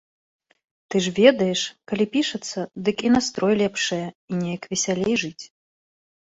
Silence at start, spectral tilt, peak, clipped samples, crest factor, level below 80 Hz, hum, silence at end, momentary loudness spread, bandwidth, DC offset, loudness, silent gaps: 0.9 s; -4 dB/octave; -2 dBFS; under 0.1%; 22 dB; -60 dBFS; none; 0.95 s; 13 LU; 8.2 kHz; under 0.1%; -22 LUFS; 4.15-4.28 s